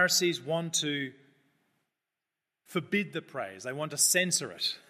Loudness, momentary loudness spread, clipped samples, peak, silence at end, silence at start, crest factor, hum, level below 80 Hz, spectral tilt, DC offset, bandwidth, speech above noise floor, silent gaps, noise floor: -29 LUFS; 13 LU; under 0.1%; -12 dBFS; 0.1 s; 0 s; 20 dB; none; -82 dBFS; -2 dB/octave; under 0.1%; 14.5 kHz; 58 dB; none; -89 dBFS